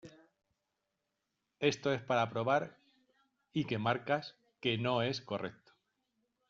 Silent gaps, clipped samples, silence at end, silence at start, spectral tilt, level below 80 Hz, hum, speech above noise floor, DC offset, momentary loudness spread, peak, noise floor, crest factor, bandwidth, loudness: none; under 0.1%; 0.95 s; 0.05 s; -4 dB/octave; -74 dBFS; none; 52 dB; under 0.1%; 9 LU; -16 dBFS; -86 dBFS; 22 dB; 7.6 kHz; -35 LUFS